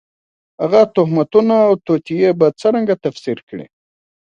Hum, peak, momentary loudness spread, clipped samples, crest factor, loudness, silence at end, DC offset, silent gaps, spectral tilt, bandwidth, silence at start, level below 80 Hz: none; 0 dBFS; 12 LU; under 0.1%; 16 dB; -15 LUFS; 0.65 s; under 0.1%; 3.43-3.47 s; -8 dB/octave; 8.4 kHz; 0.6 s; -62 dBFS